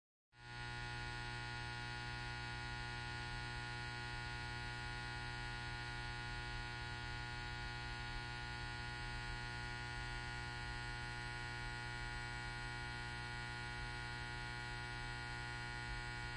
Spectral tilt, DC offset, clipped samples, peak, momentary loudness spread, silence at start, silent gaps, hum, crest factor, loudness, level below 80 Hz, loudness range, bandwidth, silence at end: -4 dB/octave; under 0.1%; under 0.1%; -34 dBFS; 0 LU; 0.35 s; none; 60 Hz at -50 dBFS; 12 dB; -46 LUFS; -54 dBFS; 0 LU; 11.5 kHz; 0 s